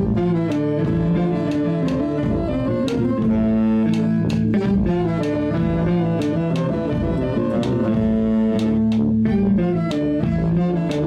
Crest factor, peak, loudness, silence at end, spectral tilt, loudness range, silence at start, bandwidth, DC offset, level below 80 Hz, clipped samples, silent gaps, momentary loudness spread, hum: 10 dB; -8 dBFS; -20 LUFS; 0 s; -9 dB/octave; 1 LU; 0 s; 8.8 kHz; under 0.1%; -36 dBFS; under 0.1%; none; 3 LU; none